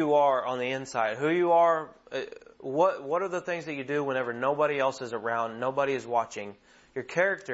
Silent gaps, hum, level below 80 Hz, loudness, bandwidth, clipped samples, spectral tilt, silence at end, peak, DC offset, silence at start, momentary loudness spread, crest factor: none; none; -72 dBFS; -28 LUFS; 8 kHz; under 0.1%; -5 dB/octave; 0 s; -10 dBFS; under 0.1%; 0 s; 13 LU; 18 dB